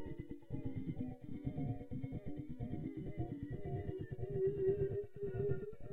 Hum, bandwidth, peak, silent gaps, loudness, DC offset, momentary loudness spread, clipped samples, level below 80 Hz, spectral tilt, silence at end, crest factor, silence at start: none; 3.9 kHz; -24 dBFS; none; -43 LUFS; under 0.1%; 10 LU; under 0.1%; -56 dBFS; -11 dB/octave; 0 s; 16 dB; 0 s